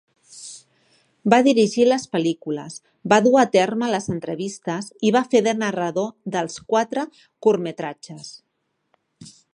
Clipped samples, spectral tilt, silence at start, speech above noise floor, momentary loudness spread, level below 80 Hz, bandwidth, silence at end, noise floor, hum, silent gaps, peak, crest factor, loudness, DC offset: under 0.1%; -5 dB/octave; 0.3 s; 48 dB; 21 LU; -66 dBFS; 11 kHz; 0.25 s; -68 dBFS; none; none; -2 dBFS; 20 dB; -21 LUFS; under 0.1%